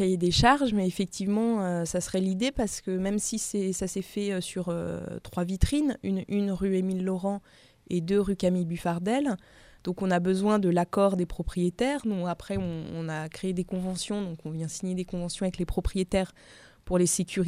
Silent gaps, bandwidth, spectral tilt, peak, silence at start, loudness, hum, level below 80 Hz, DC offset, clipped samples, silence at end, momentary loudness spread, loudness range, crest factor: none; 15.5 kHz; -5.5 dB/octave; -6 dBFS; 0 s; -28 LUFS; none; -44 dBFS; under 0.1%; under 0.1%; 0 s; 9 LU; 5 LU; 22 dB